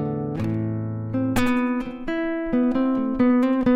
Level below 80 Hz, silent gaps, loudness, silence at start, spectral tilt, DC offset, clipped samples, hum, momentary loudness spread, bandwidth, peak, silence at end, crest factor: -44 dBFS; none; -23 LUFS; 0 s; -7.5 dB/octave; under 0.1%; under 0.1%; none; 8 LU; 15 kHz; -6 dBFS; 0 s; 16 dB